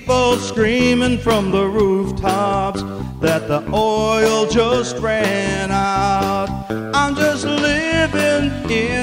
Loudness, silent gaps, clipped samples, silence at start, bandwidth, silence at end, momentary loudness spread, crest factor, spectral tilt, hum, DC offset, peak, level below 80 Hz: -17 LUFS; none; under 0.1%; 0 s; 16 kHz; 0 s; 5 LU; 14 dB; -5 dB/octave; none; under 0.1%; -2 dBFS; -36 dBFS